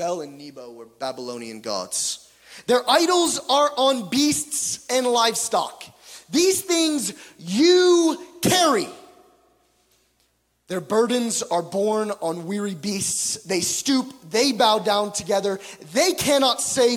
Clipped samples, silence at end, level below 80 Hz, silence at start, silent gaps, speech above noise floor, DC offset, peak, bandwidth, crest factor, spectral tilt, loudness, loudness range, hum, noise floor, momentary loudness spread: under 0.1%; 0 s; -64 dBFS; 0 s; none; 45 dB; under 0.1%; -4 dBFS; 17 kHz; 18 dB; -2.5 dB/octave; -21 LUFS; 5 LU; none; -67 dBFS; 15 LU